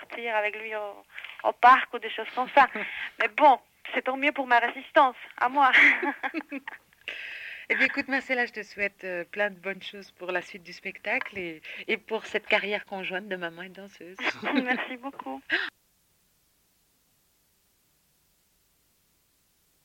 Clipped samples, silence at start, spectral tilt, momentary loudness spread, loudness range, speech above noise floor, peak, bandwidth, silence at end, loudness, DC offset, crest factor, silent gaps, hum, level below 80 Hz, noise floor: under 0.1%; 0 s; -4 dB/octave; 18 LU; 9 LU; 42 dB; -8 dBFS; 17 kHz; 4.15 s; -26 LUFS; under 0.1%; 20 dB; none; none; -72 dBFS; -69 dBFS